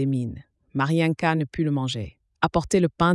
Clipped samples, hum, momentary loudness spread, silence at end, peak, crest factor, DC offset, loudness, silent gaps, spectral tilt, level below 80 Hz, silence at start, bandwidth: under 0.1%; none; 12 LU; 0 s; -6 dBFS; 16 dB; under 0.1%; -24 LUFS; none; -6.5 dB/octave; -48 dBFS; 0 s; 12 kHz